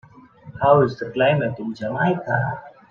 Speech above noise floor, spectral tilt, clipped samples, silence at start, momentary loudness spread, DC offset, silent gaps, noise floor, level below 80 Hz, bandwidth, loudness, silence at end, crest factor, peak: 25 dB; -8.5 dB/octave; under 0.1%; 0.15 s; 11 LU; under 0.1%; none; -44 dBFS; -56 dBFS; 6.8 kHz; -21 LUFS; 0.2 s; 18 dB; -2 dBFS